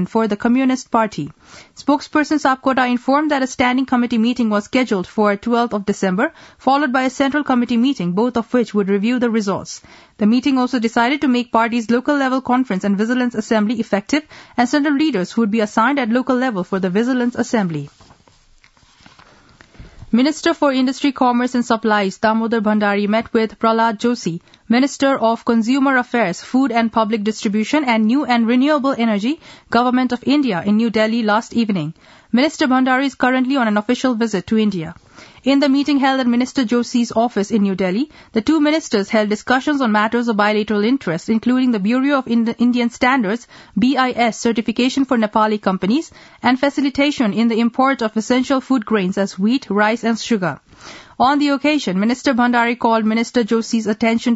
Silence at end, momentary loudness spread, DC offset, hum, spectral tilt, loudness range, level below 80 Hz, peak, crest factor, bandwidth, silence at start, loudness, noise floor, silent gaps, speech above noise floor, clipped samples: 0 s; 5 LU; under 0.1%; none; -5.5 dB/octave; 2 LU; -54 dBFS; 0 dBFS; 16 dB; 8 kHz; 0 s; -17 LUFS; -51 dBFS; none; 35 dB; under 0.1%